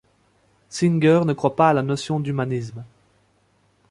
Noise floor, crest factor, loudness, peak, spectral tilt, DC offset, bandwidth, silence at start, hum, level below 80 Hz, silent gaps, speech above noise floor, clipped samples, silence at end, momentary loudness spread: -62 dBFS; 20 dB; -20 LUFS; -2 dBFS; -7 dB/octave; under 0.1%; 11.5 kHz; 0.7 s; none; -60 dBFS; none; 43 dB; under 0.1%; 1.05 s; 16 LU